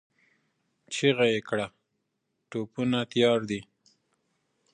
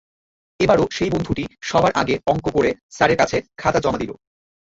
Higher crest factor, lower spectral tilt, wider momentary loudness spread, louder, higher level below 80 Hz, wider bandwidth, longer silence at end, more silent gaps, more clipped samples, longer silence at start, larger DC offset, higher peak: about the same, 22 dB vs 18 dB; about the same, -5 dB/octave vs -5.5 dB/octave; first, 13 LU vs 7 LU; second, -27 LUFS vs -20 LUFS; second, -68 dBFS vs -44 dBFS; first, 10 kHz vs 8 kHz; first, 1.1 s vs 0.65 s; second, none vs 2.83-2.89 s; neither; first, 0.9 s vs 0.6 s; neither; second, -8 dBFS vs -2 dBFS